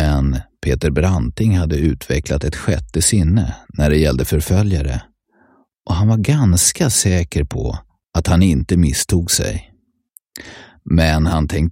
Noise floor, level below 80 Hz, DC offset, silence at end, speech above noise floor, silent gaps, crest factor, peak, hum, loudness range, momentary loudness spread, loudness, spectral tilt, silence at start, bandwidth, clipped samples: -55 dBFS; -26 dBFS; under 0.1%; 0 s; 40 dB; none; 16 dB; 0 dBFS; none; 2 LU; 10 LU; -16 LUFS; -5 dB/octave; 0 s; 16.5 kHz; under 0.1%